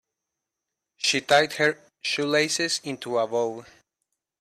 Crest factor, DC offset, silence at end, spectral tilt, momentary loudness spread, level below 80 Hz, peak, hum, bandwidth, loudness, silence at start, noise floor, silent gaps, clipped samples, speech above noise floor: 20 dB; under 0.1%; 0.8 s; -2.5 dB/octave; 9 LU; -70 dBFS; -6 dBFS; none; 14.5 kHz; -24 LUFS; 1 s; -85 dBFS; none; under 0.1%; 61 dB